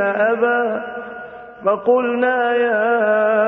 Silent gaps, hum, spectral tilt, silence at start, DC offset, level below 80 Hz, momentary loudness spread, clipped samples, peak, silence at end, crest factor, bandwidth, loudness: none; none; -8 dB/octave; 0 s; under 0.1%; -64 dBFS; 15 LU; under 0.1%; -4 dBFS; 0 s; 14 dB; 3.9 kHz; -17 LUFS